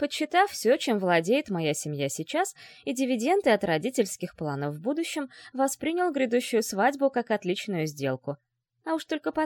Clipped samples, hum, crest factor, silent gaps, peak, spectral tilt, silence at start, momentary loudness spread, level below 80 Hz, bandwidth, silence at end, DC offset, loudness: under 0.1%; none; 18 dB; none; -8 dBFS; -4.5 dB/octave; 0 s; 9 LU; -70 dBFS; 17.5 kHz; 0 s; under 0.1%; -27 LUFS